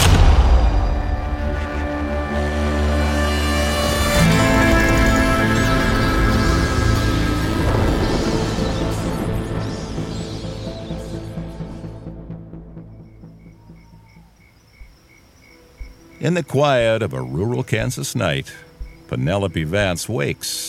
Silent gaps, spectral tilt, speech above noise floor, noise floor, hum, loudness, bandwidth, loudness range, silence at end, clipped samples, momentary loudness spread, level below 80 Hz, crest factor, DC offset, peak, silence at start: none; -5.5 dB/octave; 30 dB; -50 dBFS; none; -19 LUFS; 17 kHz; 16 LU; 0 s; under 0.1%; 17 LU; -24 dBFS; 18 dB; under 0.1%; -2 dBFS; 0 s